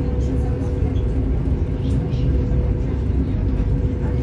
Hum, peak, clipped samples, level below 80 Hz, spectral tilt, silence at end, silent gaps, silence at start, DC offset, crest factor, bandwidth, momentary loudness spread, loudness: none; -8 dBFS; under 0.1%; -22 dBFS; -9.5 dB/octave; 0 s; none; 0 s; under 0.1%; 12 dB; 7 kHz; 2 LU; -22 LUFS